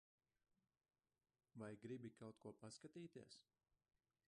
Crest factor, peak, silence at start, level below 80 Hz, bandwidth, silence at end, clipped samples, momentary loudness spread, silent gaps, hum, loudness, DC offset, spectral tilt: 18 dB; -44 dBFS; 1.55 s; under -90 dBFS; 10 kHz; 0.9 s; under 0.1%; 11 LU; none; none; -59 LUFS; under 0.1%; -5.5 dB/octave